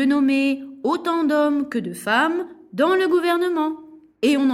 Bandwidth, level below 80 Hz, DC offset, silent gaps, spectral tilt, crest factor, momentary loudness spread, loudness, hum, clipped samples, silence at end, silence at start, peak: 14.5 kHz; -66 dBFS; under 0.1%; none; -4.5 dB/octave; 14 dB; 8 LU; -21 LUFS; none; under 0.1%; 0 s; 0 s; -6 dBFS